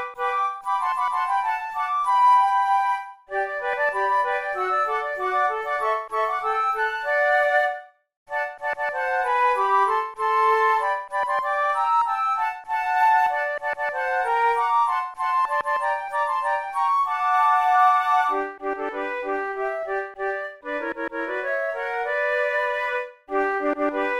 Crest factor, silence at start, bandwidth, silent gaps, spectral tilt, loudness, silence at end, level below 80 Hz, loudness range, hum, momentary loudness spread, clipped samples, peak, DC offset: 16 dB; 0 s; 14.5 kHz; 8.17-8.26 s; -2.5 dB/octave; -23 LUFS; 0 s; -62 dBFS; 4 LU; none; 9 LU; under 0.1%; -8 dBFS; 0.1%